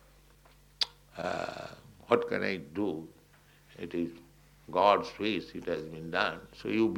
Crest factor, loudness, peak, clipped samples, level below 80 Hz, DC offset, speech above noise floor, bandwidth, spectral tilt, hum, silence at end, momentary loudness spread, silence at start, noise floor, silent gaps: 26 dB; -32 LUFS; -8 dBFS; under 0.1%; -64 dBFS; under 0.1%; 30 dB; 16.5 kHz; -5 dB/octave; none; 0 s; 15 LU; 0.8 s; -61 dBFS; none